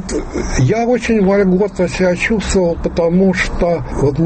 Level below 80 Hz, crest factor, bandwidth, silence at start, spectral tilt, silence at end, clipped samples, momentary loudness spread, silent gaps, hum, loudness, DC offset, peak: -26 dBFS; 10 dB; 8.8 kHz; 0 s; -6 dB/octave; 0 s; under 0.1%; 4 LU; none; none; -15 LUFS; under 0.1%; -4 dBFS